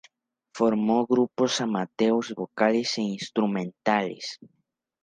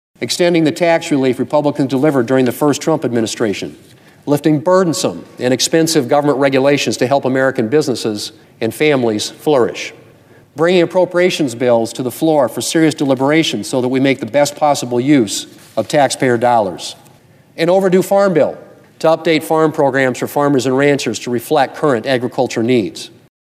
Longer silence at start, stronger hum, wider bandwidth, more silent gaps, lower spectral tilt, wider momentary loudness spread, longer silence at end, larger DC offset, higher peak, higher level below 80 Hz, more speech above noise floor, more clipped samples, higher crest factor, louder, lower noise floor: first, 0.55 s vs 0.2 s; neither; second, 9.6 kHz vs 15.5 kHz; neither; about the same, -5 dB/octave vs -5 dB/octave; first, 11 LU vs 8 LU; first, 0.65 s vs 0.35 s; neither; second, -6 dBFS vs 0 dBFS; second, -72 dBFS vs -64 dBFS; first, 38 dB vs 32 dB; neither; first, 20 dB vs 14 dB; second, -25 LUFS vs -14 LUFS; first, -63 dBFS vs -46 dBFS